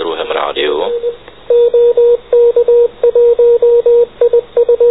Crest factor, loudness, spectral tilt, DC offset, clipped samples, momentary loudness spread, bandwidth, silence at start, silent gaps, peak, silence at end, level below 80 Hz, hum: 8 dB; -10 LUFS; -7.5 dB/octave; 0.8%; under 0.1%; 8 LU; 4 kHz; 0 s; none; -2 dBFS; 0 s; -46 dBFS; none